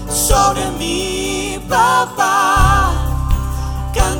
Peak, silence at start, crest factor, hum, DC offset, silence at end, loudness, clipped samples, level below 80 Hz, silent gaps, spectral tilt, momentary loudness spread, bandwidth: 0 dBFS; 0 s; 14 dB; none; under 0.1%; 0 s; -15 LUFS; under 0.1%; -20 dBFS; none; -3.5 dB/octave; 8 LU; over 20 kHz